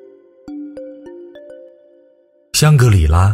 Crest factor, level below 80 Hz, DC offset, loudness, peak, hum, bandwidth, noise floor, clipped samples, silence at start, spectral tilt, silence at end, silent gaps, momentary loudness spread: 16 dB; -26 dBFS; under 0.1%; -12 LUFS; 0 dBFS; none; 16 kHz; -53 dBFS; under 0.1%; 0.45 s; -5.5 dB/octave; 0 s; none; 26 LU